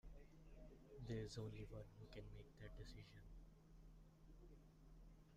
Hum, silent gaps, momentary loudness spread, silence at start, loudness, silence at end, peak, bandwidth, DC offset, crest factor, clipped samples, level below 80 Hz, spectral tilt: none; none; 17 LU; 0.05 s; -59 LUFS; 0 s; -40 dBFS; 15 kHz; under 0.1%; 18 dB; under 0.1%; -64 dBFS; -6.5 dB/octave